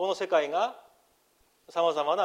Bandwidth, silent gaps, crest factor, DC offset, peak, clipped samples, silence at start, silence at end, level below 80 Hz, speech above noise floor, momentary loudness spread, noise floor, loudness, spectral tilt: 12.5 kHz; none; 16 dB; under 0.1%; -12 dBFS; under 0.1%; 0 s; 0 s; -80 dBFS; 40 dB; 7 LU; -67 dBFS; -28 LUFS; -3.5 dB/octave